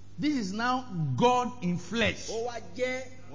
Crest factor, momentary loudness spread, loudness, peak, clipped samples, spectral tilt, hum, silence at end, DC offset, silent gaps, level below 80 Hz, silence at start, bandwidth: 20 dB; 9 LU; -30 LUFS; -10 dBFS; under 0.1%; -5 dB/octave; none; 0 s; 0.8%; none; -56 dBFS; 0 s; 7.6 kHz